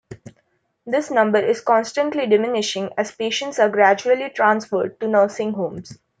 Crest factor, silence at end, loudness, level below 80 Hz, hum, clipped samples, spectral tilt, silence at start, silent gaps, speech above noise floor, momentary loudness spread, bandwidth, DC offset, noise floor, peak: 18 dB; 0.25 s; -19 LUFS; -66 dBFS; none; under 0.1%; -4 dB/octave; 0.1 s; none; 47 dB; 8 LU; 9.4 kHz; under 0.1%; -66 dBFS; -2 dBFS